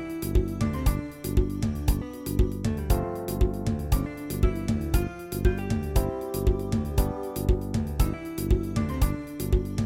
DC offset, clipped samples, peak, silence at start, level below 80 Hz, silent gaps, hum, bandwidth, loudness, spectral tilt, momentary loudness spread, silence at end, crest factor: under 0.1%; under 0.1%; -10 dBFS; 0 s; -30 dBFS; none; none; 17 kHz; -28 LUFS; -7 dB/octave; 4 LU; 0 s; 16 dB